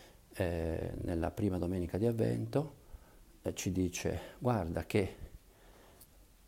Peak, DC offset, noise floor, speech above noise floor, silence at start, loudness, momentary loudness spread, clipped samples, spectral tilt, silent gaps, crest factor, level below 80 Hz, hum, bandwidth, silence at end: -18 dBFS; under 0.1%; -60 dBFS; 25 dB; 0 s; -36 LUFS; 9 LU; under 0.1%; -6.5 dB/octave; none; 18 dB; -52 dBFS; none; 16 kHz; 0.25 s